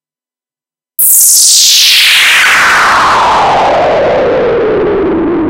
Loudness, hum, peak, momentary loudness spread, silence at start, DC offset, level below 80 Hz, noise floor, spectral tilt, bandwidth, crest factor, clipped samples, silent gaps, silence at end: -5 LUFS; none; 0 dBFS; 8 LU; 1 s; under 0.1%; -36 dBFS; under -90 dBFS; -0.5 dB/octave; over 20 kHz; 8 dB; 0.8%; none; 0 s